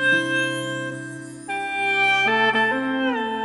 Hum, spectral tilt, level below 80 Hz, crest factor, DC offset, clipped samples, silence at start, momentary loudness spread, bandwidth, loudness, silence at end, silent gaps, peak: none; -3.5 dB/octave; -64 dBFS; 16 dB; under 0.1%; under 0.1%; 0 s; 14 LU; 11.5 kHz; -21 LUFS; 0 s; none; -6 dBFS